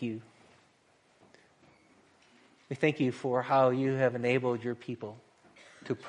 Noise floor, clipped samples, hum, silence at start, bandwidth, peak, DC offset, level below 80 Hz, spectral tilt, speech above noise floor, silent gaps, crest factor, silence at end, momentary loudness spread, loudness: -67 dBFS; under 0.1%; none; 0 s; 10.5 kHz; -14 dBFS; under 0.1%; -76 dBFS; -7.5 dB/octave; 37 dB; none; 20 dB; 0 s; 18 LU; -30 LUFS